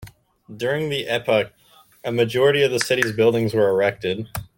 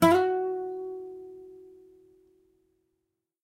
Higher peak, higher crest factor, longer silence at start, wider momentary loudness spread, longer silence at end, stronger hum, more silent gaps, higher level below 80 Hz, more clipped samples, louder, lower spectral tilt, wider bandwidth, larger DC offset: first, -2 dBFS vs -8 dBFS; about the same, 18 dB vs 22 dB; about the same, 0 s vs 0 s; second, 10 LU vs 25 LU; second, 0.1 s vs 1.8 s; neither; neither; first, -54 dBFS vs -70 dBFS; neither; first, -20 LUFS vs -29 LUFS; second, -4.5 dB/octave vs -6 dB/octave; about the same, 17 kHz vs 16 kHz; neither